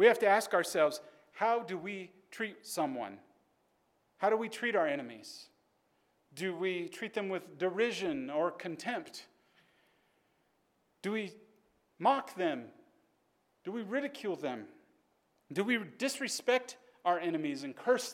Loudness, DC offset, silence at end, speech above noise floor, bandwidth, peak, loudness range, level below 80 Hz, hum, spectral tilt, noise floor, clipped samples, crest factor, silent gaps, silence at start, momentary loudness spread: -34 LUFS; under 0.1%; 0 s; 42 dB; 16.5 kHz; -12 dBFS; 5 LU; -86 dBFS; none; -4 dB/octave; -75 dBFS; under 0.1%; 24 dB; none; 0 s; 15 LU